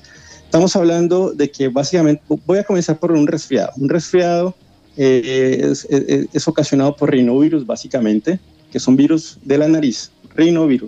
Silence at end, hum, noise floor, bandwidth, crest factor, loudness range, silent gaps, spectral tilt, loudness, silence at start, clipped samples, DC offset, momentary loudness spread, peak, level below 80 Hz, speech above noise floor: 0 s; none; -42 dBFS; 8.2 kHz; 14 dB; 1 LU; none; -6 dB/octave; -16 LUFS; 0.3 s; under 0.1%; under 0.1%; 7 LU; -2 dBFS; -54 dBFS; 27 dB